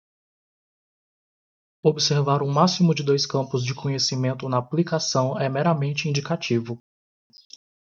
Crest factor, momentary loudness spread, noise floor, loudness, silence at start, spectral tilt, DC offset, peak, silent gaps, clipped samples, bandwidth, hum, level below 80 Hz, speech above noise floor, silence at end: 20 dB; 6 LU; under -90 dBFS; -23 LUFS; 1.85 s; -5 dB/octave; under 0.1%; -4 dBFS; none; under 0.1%; 7.6 kHz; none; -66 dBFS; over 68 dB; 1.15 s